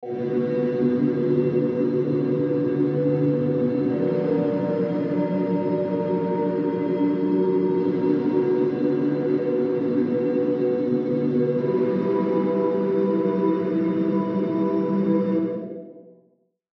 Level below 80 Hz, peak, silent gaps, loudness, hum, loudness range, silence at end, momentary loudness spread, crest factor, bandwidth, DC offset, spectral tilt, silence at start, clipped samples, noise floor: -68 dBFS; -10 dBFS; none; -23 LUFS; none; 1 LU; 0.65 s; 2 LU; 12 dB; 5.8 kHz; under 0.1%; -11 dB/octave; 0 s; under 0.1%; -64 dBFS